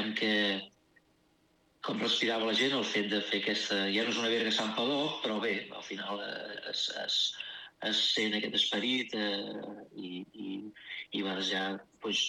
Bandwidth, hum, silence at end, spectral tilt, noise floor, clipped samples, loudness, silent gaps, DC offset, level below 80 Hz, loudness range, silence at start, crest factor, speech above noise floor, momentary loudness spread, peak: 12.5 kHz; none; 0 s; -3 dB/octave; -70 dBFS; under 0.1%; -31 LUFS; none; under 0.1%; -82 dBFS; 4 LU; 0 s; 18 dB; 37 dB; 14 LU; -16 dBFS